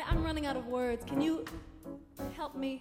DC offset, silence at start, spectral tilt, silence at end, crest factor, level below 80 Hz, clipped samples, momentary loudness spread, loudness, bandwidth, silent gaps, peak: under 0.1%; 0 s; -6.5 dB/octave; 0 s; 18 dB; -44 dBFS; under 0.1%; 15 LU; -36 LUFS; 16.5 kHz; none; -16 dBFS